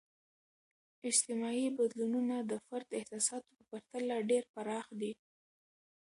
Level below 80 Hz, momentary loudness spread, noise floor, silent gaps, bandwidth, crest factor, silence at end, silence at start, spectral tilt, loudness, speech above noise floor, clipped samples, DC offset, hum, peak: -86 dBFS; 14 LU; under -90 dBFS; 4.49-4.54 s; 11.5 kHz; 22 dB; 0.9 s; 1.05 s; -3 dB/octave; -36 LUFS; over 53 dB; under 0.1%; under 0.1%; none; -16 dBFS